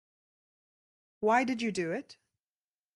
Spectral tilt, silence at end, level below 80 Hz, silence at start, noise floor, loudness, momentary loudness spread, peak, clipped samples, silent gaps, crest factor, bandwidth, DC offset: -5 dB/octave; 0.85 s; -78 dBFS; 1.2 s; under -90 dBFS; -31 LUFS; 9 LU; -14 dBFS; under 0.1%; none; 22 dB; 11.5 kHz; under 0.1%